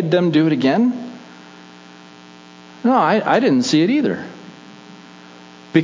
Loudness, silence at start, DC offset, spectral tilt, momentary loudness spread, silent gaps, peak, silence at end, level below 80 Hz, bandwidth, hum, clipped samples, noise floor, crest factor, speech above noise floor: -16 LUFS; 0 s; under 0.1%; -6 dB/octave; 20 LU; none; -2 dBFS; 0 s; -68 dBFS; 7.6 kHz; none; under 0.1%; -42 dBFS; 16 dB; 27 dB